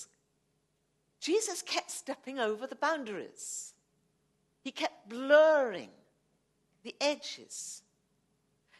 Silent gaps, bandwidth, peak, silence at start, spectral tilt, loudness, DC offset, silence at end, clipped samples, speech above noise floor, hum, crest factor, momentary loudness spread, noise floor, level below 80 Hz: none; 12.5 kHz; -12 dBFS; 0 s; -1.5 dB/octave; -32 LUFS; under 0.1%; 1 s; under 0.1%; 45 dB; none; 24 dB; 21 LU; -77 dBFS; -88 dBFS